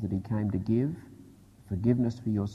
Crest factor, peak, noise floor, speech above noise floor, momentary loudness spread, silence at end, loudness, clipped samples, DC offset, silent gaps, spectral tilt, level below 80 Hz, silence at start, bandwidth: 18 dB; -12 dBFS; -53 dBFS; 25 dB; 8 LU; 0 s; -30 LUFS; under 0.1%; under 0.1%; none; -9.5 dB/octave; -50 dBFS; 0 s; 9.6 kHz